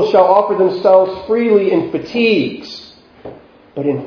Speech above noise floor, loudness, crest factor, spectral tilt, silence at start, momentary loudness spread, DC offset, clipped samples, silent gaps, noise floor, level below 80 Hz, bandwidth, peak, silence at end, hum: 24 dB; -13 LUFS; 14 dB; -7 dB/octave; 0 s; 18 LU; under 0.1%; under 0.1%; none; -37 dBFS; -54 dBFS; 5.4 kHz; 0 dBFS; 0 s; none